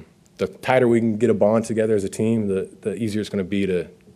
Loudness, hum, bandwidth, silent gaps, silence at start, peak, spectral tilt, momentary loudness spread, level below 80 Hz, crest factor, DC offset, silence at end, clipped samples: -21 LUFS; none; 13 kHz; none; 0 s; -4 dBFS; -6.5 dB/octave; 9 LU; -58 dBFS; 18 dB; under 0.1%; 0.25 s; under 0.1%